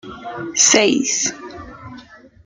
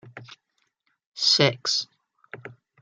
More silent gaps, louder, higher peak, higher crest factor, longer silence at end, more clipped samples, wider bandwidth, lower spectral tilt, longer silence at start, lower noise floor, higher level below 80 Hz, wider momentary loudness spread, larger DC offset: second, none vs 1.06-1.12 s; first, -15 LUFS vs -21 LUFS; about the same, 0 dBFS vs -2 dBFS; second, 20 dB vs 26 dB; about the same, 0.3 s vs 0.3 s; neither; about the same, 11 kHz vs 12 kHz; second, -1 dB/octave vs -3 dB/octave; about the same, 0.05 s vs 0.05 s; second, -42 dBFS vs -74 dBFS; first, -54 dBFS vs -72 dBFS; about the same, 24 LU vs 25 LU; neither